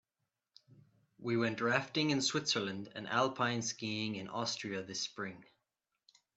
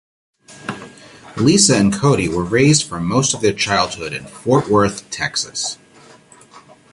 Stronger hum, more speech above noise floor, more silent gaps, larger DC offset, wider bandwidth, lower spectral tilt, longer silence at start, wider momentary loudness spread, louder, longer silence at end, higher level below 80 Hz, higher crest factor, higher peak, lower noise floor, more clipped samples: neither; first, 52 dB vs 29 dB; neither; neither; second, 8.8 kHz vs 11.5 kHz; about the same, -3.5 dB/octave vs -4 dB/octave; first, 0.7 s vs 0.5 s; second, 9 LU vs 18 LU; second, -36 LUFS vs -16 LUFS; first, 0.95 s vs 0.35 s; second, -80 dBFS vs -46 dBFS; first, 24 dB vs 18 dB; second, -14 dBFS vs 0 dBFS; first, -88 dBFS vs -45 dBFS; neither